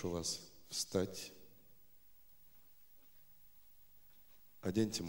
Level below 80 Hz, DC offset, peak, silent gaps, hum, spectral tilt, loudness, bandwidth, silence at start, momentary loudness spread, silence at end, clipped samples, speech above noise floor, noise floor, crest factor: -68 dBFS; under 0.1%; -22 dBFS; none; 50 Hz at -80 dBFS; -4 dB/octave; -41 LUFS; 19 kHz; 0 s; 26 LU; 0 s; under 0.1%; 29 dB; -68 dBFS; 24 dB